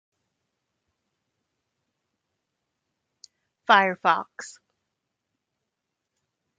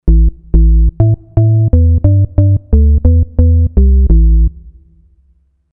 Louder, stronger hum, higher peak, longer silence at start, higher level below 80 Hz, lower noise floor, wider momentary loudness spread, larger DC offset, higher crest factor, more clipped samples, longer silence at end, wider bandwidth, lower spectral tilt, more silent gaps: second, -21 LUFS vs -11 LUFS; neither; second, -4 dBFS vs 0 dBFS; first, 3.7 s vs 0.05 s; second, -86 dBFS vs -10 dBFS; first, -83 dBFS vs -53 dBFS; first, 22 LU vs 3 LU; neither; first, 28 dB vs 8 dB; neither; first, 2.1 s vs 1.05 s; first, 9 kHz vs 1.3 kHz; second, -3.5 dB/octave vs -15 dB/octave; neither